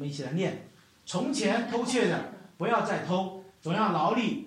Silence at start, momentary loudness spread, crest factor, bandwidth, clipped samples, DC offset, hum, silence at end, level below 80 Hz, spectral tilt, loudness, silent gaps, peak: 0 s; 12 LU; 16 dB; 13 kHz; under 0.1%; under 0.1%; none; 0 s; -72 dBFS; -5 dB/octave; -29 LUFS; none; -12 dBFS